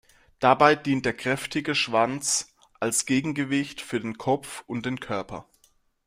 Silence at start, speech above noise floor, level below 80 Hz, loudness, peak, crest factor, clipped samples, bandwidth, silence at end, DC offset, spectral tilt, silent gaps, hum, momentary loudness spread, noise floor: 0.4 s; 40 dB; -60 dBFS; -25 LUFS; -4 dBFS; 22 dB; under 0.1%; 16 kHz; 0.65 s; under 0.1%; -3.5 dB/octave; none; none; 12 LU; -65 dBFS